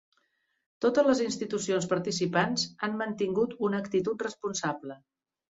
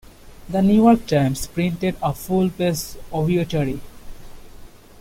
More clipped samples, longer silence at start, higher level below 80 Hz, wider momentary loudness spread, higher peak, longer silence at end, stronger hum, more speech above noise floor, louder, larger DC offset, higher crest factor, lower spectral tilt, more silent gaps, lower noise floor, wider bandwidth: neither; first, 0.8 s vs 0.25 s; second, -68 dBFS vs -40 dBFS; second, 8 LU vs 12 LU; second, -10 dBFS vs -4 dBFS; first, 0.65 s vs 0 s; neither; first, 45 dB vs 22 dB; second, -29 LUFS vs -20 LUFS; neither; about the same, 20 dB vs 18 dB; second, -4.5 dB/octave vs -6.5 dB/octave; neither; first, -74 dBFS vs -41 dBFS; second, 8 kHz vs 16.5 kHz